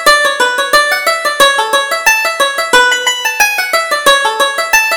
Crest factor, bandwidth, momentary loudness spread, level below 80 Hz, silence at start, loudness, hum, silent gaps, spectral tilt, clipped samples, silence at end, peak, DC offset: 10 dB; over 20 kHz; 4 LU; -44 dBFS; 0 s; -10 LUFS; none; none; 1 dB/octave; 0.3%; 0 s; 0 dBFS; under 0.1%